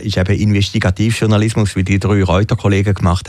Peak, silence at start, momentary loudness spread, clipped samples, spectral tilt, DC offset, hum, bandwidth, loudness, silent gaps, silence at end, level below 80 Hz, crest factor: -2 dBFS; 0 s; 2 LU; under 0.1%; -6.5 dB/octave; under 0.1%; none; 12 kHz; -14 LUFS; none; 0 s; -32 dBFS; 12 dB